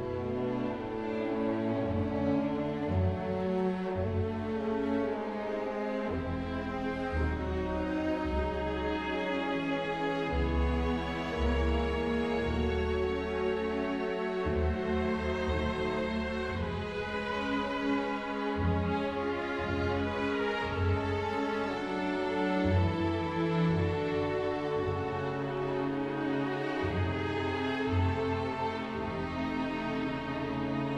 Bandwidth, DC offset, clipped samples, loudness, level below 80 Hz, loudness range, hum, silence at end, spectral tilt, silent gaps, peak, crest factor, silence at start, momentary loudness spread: 10 kHz; under 0.1%; under 0.1%; -32 LUFS; -44 dBFS; 2 LU; none; 0 s; -7.5 dB/octave; none; -18 dBFS; 14 dB; 0 s; 4 LU